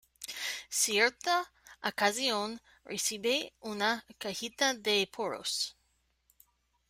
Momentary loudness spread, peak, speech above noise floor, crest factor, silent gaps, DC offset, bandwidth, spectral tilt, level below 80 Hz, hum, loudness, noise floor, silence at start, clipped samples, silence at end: 12 LU; -14 dBFS; 42 dB; 20 dB; none; under 0.1%; 16 kHz; -1 dB/octave; -74 dBFS; none; -31 LUFS; -75 dBFS; 0.2 s; under 0.1%; 1.2 s